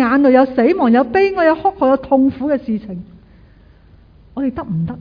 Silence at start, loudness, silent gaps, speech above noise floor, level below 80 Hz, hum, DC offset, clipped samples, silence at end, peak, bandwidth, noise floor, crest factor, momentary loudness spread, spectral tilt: 0 s; -15 LUFS; none; 31 dB; -46 dBFS; none; under 0.1%; under 0.1%; 0 s; 0 dBFS; 5.2 kHz; -45 dBFS; 16 dB; 12 LU; -9 dB/octave